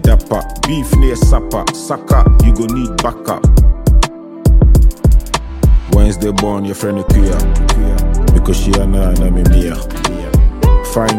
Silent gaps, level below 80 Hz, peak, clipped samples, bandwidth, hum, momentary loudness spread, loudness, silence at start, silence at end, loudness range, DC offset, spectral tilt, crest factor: none; -12 dBFS; 0 dBFS; under 0.1%; 15.5 kHz; none; 7 LU; -13 LUFS; 0 s; 0 s; 2 LU; under 0.1%; -6 dB/octave; 10 dB